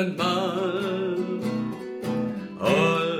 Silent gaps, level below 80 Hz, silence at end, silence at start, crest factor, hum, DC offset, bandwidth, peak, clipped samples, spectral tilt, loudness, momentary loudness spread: none; -64 dBFS; 0 s; 0 s; 18 dB; none; under 0.1%; 16 kHz; -8 dBFS; under 0.1%; -6 dB/octave; -26 LUFS; 9 LU